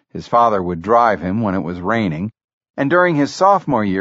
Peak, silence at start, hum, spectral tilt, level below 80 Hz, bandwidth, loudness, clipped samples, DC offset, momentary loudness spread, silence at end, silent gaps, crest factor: 0 dBFS; 0.15 s; none; -5.5 dB/octave; -50 dBFS; 8 kHz; -16 LUFS; under 0.1%; under 0.1%; 8 LU; 0 s; 2.44-2.61 s, 2.70-2.74 s; 16 dB